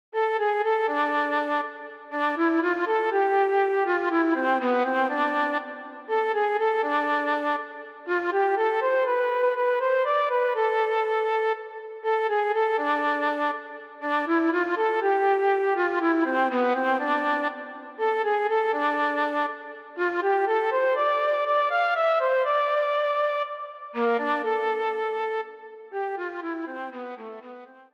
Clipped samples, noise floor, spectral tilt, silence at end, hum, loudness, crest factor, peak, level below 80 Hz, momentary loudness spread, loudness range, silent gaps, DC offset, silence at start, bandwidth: under 0.1%; -45 dBFS; -4 dB/octave; 0.2 s; none; -24 LUFS; 14 dB; -12 dBFS; -84 dBFS; 11 LU; 3 LU; none; under 0.1%; 0.15 s; 8 kHz